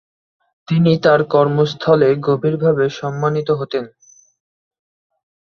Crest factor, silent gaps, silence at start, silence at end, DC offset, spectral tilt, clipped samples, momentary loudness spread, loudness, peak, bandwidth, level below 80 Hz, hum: 16 dB; none; 0.7 s; 1.55 s; under 0.1%; -7.5 dB/octave; under 0.1%; 7 LU; -16 LUFS; 0 dBFS; 6.8 kHz; -58 dBFS; none